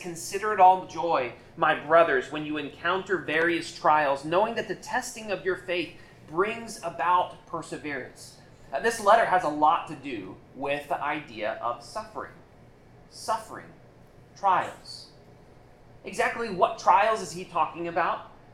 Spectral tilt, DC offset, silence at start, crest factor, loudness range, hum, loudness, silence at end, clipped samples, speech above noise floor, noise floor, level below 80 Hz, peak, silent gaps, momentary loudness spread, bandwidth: -4 dB/octave; under 0.1%; 0 s; 20 dB; 9 LU; none; -26 LUFS; 0.2 s; under 0.1%; 26 dB; -53 dBFS; -60 dBFS; -8 dBFS; none; 17 LU; 15.5 kHz